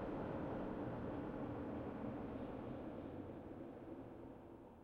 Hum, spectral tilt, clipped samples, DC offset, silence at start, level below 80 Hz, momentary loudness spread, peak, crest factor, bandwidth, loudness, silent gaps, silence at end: none; -9.5 dB/octave; under 0.1%; under 0.1%; 0 s; -64 dBFS; 9 LU; -34 dBFS; 14 dB; 6.8 kHz; -48 LUFS; none; 0 s